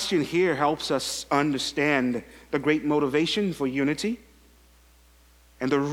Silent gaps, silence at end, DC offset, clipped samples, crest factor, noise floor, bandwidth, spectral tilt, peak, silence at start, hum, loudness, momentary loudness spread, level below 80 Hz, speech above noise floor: none; 0 s; under 0.1%; under 0.1%; 20 dB; -56 dBFS; 16.5 kHz; -4.5 dB/octave; -8 dBFS; 0 s; none; -25 LUFS; 7 LU; -56 dBFS; 31 dB